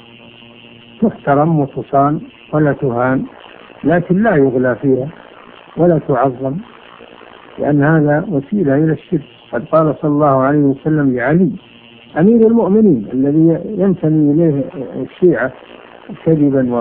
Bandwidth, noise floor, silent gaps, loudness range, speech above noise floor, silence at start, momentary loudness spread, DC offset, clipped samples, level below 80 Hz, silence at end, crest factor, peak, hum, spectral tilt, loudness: 3.7 kHz; -39 dBFS; none; 4 LU; 26 dB; 1 s; 11 LU; under 0.1%; under 0.1%; -48 dBFS; 0 s; 14 dB; 0 dBFS; none; -13 dB/octave; -14 LUFS